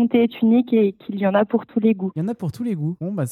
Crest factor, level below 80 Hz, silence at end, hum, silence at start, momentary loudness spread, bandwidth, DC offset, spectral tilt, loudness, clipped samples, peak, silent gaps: 14 dB; -66 dBFS; 0 s; none; 0 s; 9 LU; 5 kHz; under 0.1%; -8 dB/octave; -21 LUFS; under 0.1%; -6 dBFS; none